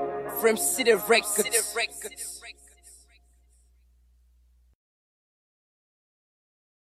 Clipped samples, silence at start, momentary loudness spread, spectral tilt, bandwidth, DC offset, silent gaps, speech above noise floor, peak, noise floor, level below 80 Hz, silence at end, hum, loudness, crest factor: under 0.1%; 0 s; 15 LU; -1 dB/octave; 15.5 kHz; under 0.1%; none; 36 dB; -8 dBFS; -61 dBFS; -62 dBFS; 4 s; 60 Hz at -65 dBFS; -25 LUFS; 24 dB